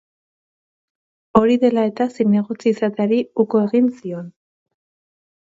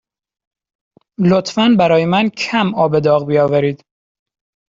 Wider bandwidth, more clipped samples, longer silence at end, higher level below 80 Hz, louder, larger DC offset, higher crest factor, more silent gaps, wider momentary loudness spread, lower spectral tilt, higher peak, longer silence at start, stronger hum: about the same, 7.8 kHz vs 7.8 kHz; neither; first, 1.25 s vs 0.95 s; about the same, -56 dBFS vs -54 dBFS; second, -18 LUFS vs -14 LUFS; neither; first, 20 dB vs 14 dB; neither; first, 12 LU vs 5 LU; first, -8 dB/octave vs -6.5 dB/octave; about the same, 0 dBFS vs 0 dBFS; first, 1.35 s vs 1.2 s; neither